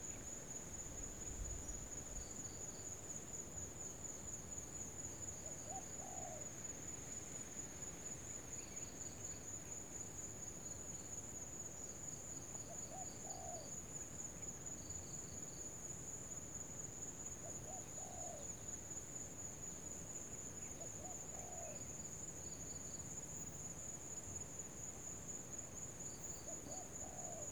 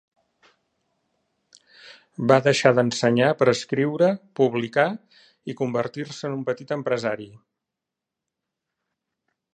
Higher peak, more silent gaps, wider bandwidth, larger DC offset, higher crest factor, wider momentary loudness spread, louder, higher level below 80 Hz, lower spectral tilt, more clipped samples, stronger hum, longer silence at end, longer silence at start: second, -34 dBFS vs -2 dBFS; neither; first, over 20 kHz vs 9.6 kHz; neither; second, 14 dB vs 24 dB; second, 1 LU vs 15 LU; second, -48 LUFS vs -22 LUFS; first, -62 dBFS vs -68 dBFS; second, -3 dB/octave vs -5.5 dB/octave; neither; neither; second, 0 s vs 2.25 s; second, 0 s vs 1.85 s